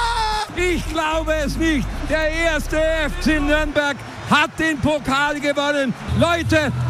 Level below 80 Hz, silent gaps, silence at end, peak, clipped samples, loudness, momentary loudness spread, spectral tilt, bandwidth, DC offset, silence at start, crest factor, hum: -30 dBFS; none; 0 s; -4 dBFS; under 0.1%; -19 LUFS; 4 LU; -5 dB/octave; 15.5 kHz; under 0.1%; 0 s; 16 dB; none